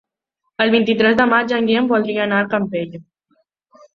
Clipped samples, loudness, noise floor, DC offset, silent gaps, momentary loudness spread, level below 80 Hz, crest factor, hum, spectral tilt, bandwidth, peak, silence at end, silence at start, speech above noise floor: under 0.1%; -16 LUFS; -75 dBFS; under 0.1%; none; 10 LU; -58 dBFS; 16 dB; none; -6.5 dB/octave; 6.8 kHz; -2 dBFS; 0.95 s; 0.6 s; 58 dB